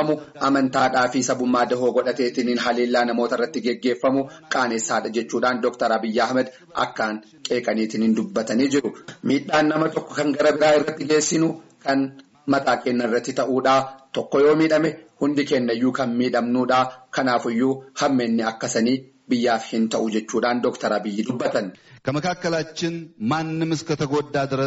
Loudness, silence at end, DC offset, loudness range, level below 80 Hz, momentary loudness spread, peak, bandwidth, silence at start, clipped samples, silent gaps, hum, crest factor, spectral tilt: -22 LUFS; 0 s; under 0.1%; 3 LU; -62 dBFS; 7 LU; -8 dBFS; 8 kHz; 0 s; under 0.1%; none; none; 14 dB; -4 dB/octave